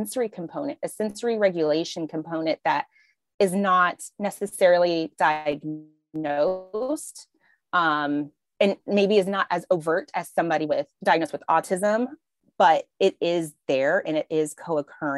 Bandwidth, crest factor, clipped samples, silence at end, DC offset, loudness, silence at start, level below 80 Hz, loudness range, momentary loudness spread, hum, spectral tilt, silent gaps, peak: 13 kHz; 18 dB; under 0.1%; 0 s; under 0.1%; -24 LUFS; 0 s; -74 dBFS; 3 LU; 11 LU; none; -5 dB/octave; 3.34-3.38 s; -6 dBFS